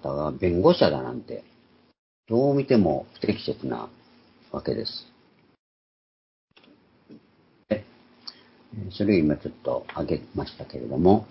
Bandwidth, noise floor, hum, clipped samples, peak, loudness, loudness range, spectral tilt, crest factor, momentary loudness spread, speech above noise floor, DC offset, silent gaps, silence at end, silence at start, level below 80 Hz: 5.8 kHz; -61 dBFS; none; under 0.1%; -4 dBFS; -25 LUFS; 15 LU; -11 dB/octave; 22 dB; 19 LU; 37 dB; under 0.1%; 1.99-2.23 s, 5.59-6.48 s; 0.05 s; 0.05 s; -48 dBFS